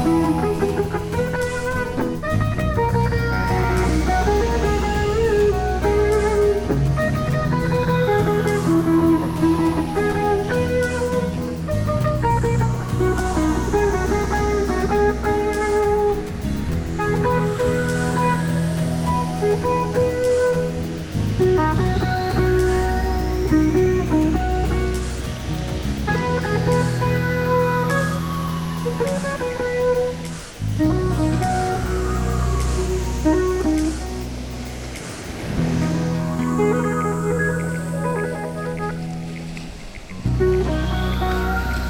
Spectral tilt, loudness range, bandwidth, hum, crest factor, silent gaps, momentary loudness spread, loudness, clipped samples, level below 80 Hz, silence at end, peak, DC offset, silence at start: -6.5 dB/octave; 4 LU; 19.5 kHz; none; 14 dB; none; 8 LU; -21 LUFS; under 0.1%; -28 dBFS; 0 s; -6 dBFS; under 0.1%; 0 s